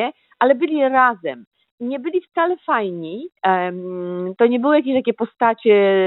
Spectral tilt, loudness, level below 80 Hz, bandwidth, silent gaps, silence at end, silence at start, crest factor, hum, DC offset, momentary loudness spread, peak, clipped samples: -9.5 dB/octave; -19 LUFS; -72 dBFS; 4.1 kHz; 1.47-1.51 s, 1.71-1.78 s; 0 s; 0 s; 16 dB; none; under 0.1%; 13 LU; -2 dBFS; under 0.1%